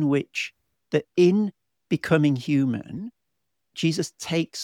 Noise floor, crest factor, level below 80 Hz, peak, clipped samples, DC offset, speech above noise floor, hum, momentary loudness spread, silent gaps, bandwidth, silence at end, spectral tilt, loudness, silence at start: -81 dBFS; 18 dB; -64 dBFS; -6 dBFS; under 0.1%; under 0.1%; 58 dB; none; 14 LU; none; 15 kHz; 0 s; -6 dB/octave; -24 LUFS; 0 s